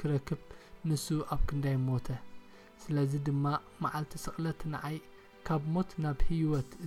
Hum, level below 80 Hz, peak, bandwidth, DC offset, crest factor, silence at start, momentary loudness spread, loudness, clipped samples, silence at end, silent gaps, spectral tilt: none; -42 dBFS; -16 dBFS; 15 kHz; under 0.1%; 16 dB; 0 s; 10 LU; -35 LUFS; under 0.1%; 0 s; none; -7 dB/octave